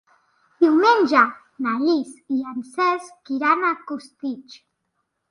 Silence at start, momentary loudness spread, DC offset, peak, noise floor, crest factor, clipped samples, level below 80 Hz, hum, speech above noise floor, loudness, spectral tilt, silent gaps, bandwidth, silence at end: 0.6 s; 15 LU; under 0.1%; -2 dBFS; -75 dBFS; 20 dB; under 0.1%; -74 dBFS; none; 54 dB; -21 LUFS; -4 dB/octave; none; 11 kHz; 0.75 s